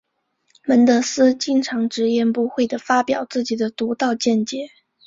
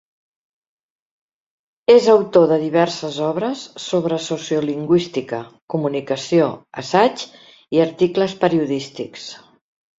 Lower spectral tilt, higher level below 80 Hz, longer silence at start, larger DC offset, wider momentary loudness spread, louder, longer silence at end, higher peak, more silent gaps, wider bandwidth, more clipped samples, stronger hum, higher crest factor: second, -4 dB/octave vs -5.5 dB/octave; about the same, -64 dBFS vs -62 dBFS; second, 0.65 s vs 1.9 s; neither; second, 8 LU vs 16 LU; about the same, -19 LUFS vs -18 LUFS; second, 0.4 s vs 0.65 s; about the same, -2 dBFS vs -2 dBFS; second, none vs 5.62-5.68 s; about the same, 7.8 kHz vs 7.8 kHz; neither; neither; about the same, 16 dB vs 18 dB